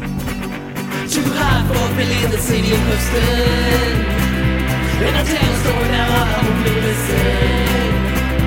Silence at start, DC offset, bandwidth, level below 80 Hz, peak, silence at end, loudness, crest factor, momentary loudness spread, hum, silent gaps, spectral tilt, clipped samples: 0 s; under 0.1%; 17 kHz; -22 dBFS; 0 dBFS; 0 s; -16 LUFS; 14 dB; 4 LU; none; none; -5 dB/octave; under 0.1%